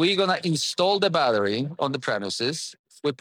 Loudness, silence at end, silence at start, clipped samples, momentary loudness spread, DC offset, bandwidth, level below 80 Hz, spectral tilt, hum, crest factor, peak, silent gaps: -24 LUFS; 0.05 s; 0 s; under 0.1%; 9 LU; under 0.1%; 16.5 kHz; -80 dBFS; -4 dB/octave; none; 16 dB; -8 dBFS; 2.79-2.84 s